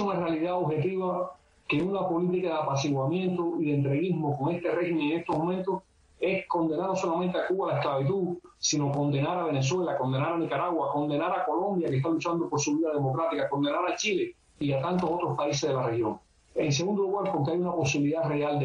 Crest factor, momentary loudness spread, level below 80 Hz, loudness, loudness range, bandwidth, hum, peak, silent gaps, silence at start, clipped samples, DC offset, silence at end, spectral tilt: 12 dB; 4 LU; -64 dBFS; -28 LUFS; 1 LU; 8 kHz; none; -16 dBFS; none; 0 s; under 0.1%; under 0.1%; 0 s; -5.5 dB/octave